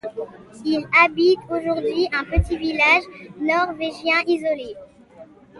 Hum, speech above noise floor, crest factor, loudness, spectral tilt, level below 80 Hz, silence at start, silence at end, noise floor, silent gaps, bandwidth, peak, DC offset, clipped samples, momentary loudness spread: none; 26 dB; 18 dB; -19 LUFS; -6 dB/octave; -36 dBFS; 0.05 s; 0 s; -46 dBFS; none; 11.5 kHz; -4 dBFS; under 0.1%; under 0.1%; 16 LU